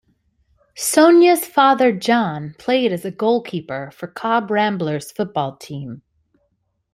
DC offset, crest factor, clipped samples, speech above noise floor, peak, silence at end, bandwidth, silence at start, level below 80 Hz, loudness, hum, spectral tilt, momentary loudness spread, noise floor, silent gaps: under 0.1%; 18 dB; under 0.1%; 52 dB; -2 dBFS; 0.95 s; 16 kHz; 0.75 s; -62 dBFS; -17 LUFS; none; -4.5 dB/octave; 17 LU; -69 dBFS; none